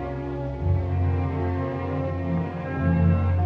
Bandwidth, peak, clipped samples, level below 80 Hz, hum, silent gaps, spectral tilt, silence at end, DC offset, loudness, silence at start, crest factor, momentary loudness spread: 4.5 kHz; -10 dBFS; under 0.1%; -38 dBFS; none; none; -10.5 dB/octave; 0 s; under 0.1%; -26 LUFS; 0 s; 14 dB; 8 LU